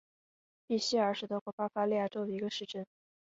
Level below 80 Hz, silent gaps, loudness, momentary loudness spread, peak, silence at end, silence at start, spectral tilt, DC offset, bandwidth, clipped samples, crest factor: -80 dBFS; 1.41-1.46 s, 1.53-1.58 s; -35 LUFS; 11 LU; -18 dBFS; 0.4 s; 0.7 s; -3.5 dB/octave; under 0.1%; 8 kHz; under 0.1%; 18 dB